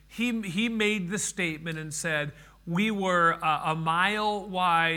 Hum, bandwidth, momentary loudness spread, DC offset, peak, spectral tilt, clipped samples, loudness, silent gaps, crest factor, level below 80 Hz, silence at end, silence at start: none; 18.5 kHz; 9 LU; under 0.1%; -10 dBFS; -4 dB/octave; under 0.1%; -27 LUFS; none; 18 dB; -58 dBFS; 0 s; 0.1 s